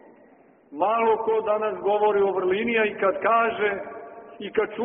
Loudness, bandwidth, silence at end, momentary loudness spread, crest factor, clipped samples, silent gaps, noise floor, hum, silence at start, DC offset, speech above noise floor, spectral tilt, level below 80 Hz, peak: -23 LUFS; 3.7 kHz; 0 s; 17 LU; 16 dB; under 0.1%; none; -55 dBFS; none; 0.7 s; under 0.1%; 32 dB; 1 dB/octave; -66 dBFS; -8 dBFS